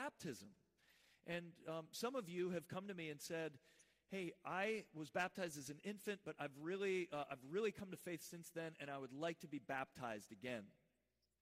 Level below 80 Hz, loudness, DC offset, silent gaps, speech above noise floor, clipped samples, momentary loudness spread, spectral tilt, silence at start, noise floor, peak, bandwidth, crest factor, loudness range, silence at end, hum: -86 dBFS; -48 LUFS; under 0.1%; none; 40 dB; under 0.1%; 9 LU; -4.5 dB/octave; 0 s; -87 dBFS; -30 dBFS; 15.5 kHz; 20 dB; 3 LU; 0.7 s; none